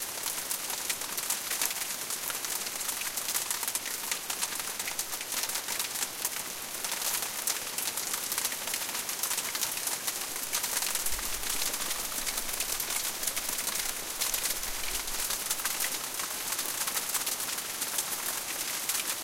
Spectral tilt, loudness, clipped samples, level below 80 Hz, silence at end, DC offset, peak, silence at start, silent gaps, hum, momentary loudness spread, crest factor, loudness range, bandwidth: 1 dB/octave; -30 LUFS; under 0.1%; -54 dBFS; 0 s; under 0.1%; -8 dBFS; 0 s; none; none; 3 LU; 24 dB; 1 LU; 17 kHz